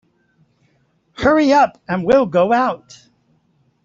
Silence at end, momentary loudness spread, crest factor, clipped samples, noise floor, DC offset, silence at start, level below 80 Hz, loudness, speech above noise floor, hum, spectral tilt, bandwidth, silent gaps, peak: 1.1 s; 9 LU; 16 dB; under 0.1%; -61 dBFS; under 0.1%; 1.2 s; -48 dBFS; -15 LUFS; 46 dB; none; -6 dB/octave; 7.6 kHz; none; -2 dBFS